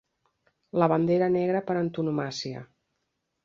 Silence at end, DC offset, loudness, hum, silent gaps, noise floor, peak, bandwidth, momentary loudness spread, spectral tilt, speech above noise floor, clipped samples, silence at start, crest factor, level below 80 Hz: 0.8 s; under 0.1%; -26 LUFS; none; none; -79 dBFS; -6 dBFS; 7.6 kHz; 11 LU; -7 dB/octave; 54 dB; under 0.1%; 0.75 s; 20 dB; -66 dBFS